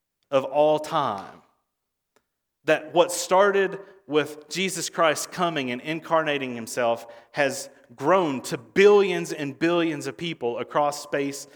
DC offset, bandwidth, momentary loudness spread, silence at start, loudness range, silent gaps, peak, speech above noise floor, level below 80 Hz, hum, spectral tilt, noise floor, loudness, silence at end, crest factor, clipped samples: under 0.1%; over 20 kHz; 11 LU; 0.3 s; 3 LU; none; -4 dBFS; 57 dB; -74 dBFS; none; -4 dB/octave; -81 dBFS; -24 LUFS; 0.1 s; 20 dB; under 0.1%